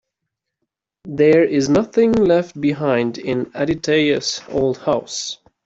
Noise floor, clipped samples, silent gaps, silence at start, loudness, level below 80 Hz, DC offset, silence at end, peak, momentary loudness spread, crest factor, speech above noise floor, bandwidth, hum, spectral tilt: -80 dBFS; under 0.1%; none; 1.05 s; -18 LUFS; -50 dBFS; under 0.1%; 0.3 s; -4 dBFS; 9 LU; 16 dB; 62 dB; 8 kHz; none; -5 dB/octave